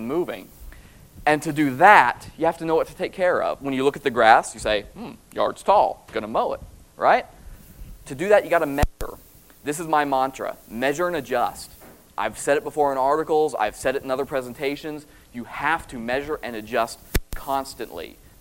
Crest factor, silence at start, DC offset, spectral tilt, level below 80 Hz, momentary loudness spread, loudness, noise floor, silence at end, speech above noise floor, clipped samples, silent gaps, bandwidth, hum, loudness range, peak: 22 dB; 0 s; under 0.1%; -4.5 dB/octave; -42 dBFS; 17 LU; -22 LUFS; -46 dBFS; 0.3 s; 23 dB; under 0.1%; none; 16.5 kHz; none; 7 LU; 0 dBFS